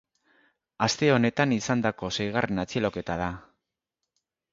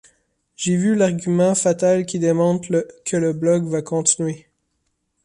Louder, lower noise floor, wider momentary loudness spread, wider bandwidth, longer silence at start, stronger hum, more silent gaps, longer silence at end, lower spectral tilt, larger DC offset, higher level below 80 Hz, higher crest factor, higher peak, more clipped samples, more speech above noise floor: second, -26 LUFS vs -19 LUFS; first, -85 dBFS vs -71 dBFS; first, 9 LU vs 6 LU; second, 7.8 kHz vs 11.5 kHz; first, 0.8 s vs 0.6 s; neither; neither; first, 1.1 s vs 0.85 s; about the same, -5 dB/octave vs -5.5 dB/octave; neither; first, -54 dBFS vs -60 dBFS; about the same, 22 dB vs 18 dB; second, -6 dBFS vs -2 dBFS; neither; first, 59 dB vs 53 dB